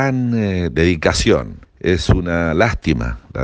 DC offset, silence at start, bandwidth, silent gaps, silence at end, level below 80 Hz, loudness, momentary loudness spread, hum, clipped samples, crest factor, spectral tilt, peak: under 0.1%; 0 s; 9.8 kHz; none; 0 s; -28 dBFS; -17 LUFS; 6 LU; none; under 0.1%; 16 dB; -6 dB/octave; 0 dBFS